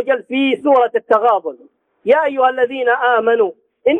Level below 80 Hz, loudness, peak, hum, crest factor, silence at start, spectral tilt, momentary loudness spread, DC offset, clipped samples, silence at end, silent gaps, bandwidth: -70 dBFS; -15 LUFS; -2 dBFS; none; 14 dB; 0 s; -5.5 dB/octave; 7 LU; under 0.1%; under 0.1%; 0 s; none; 3.9 kHz